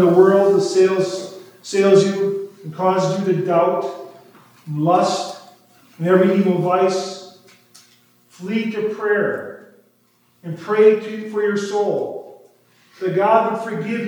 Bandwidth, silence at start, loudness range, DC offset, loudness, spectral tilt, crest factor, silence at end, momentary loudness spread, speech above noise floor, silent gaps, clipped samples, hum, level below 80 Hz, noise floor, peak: 19.5 kHz; 0 s; 5 LU; under 0.1%; -18 LUFS; -6 dB/octave; 18 dB; 0 s; 18 LU; 42 dB; none; under 0.1%; none; -80 dBFS; -59 dBFS; 0 dBFS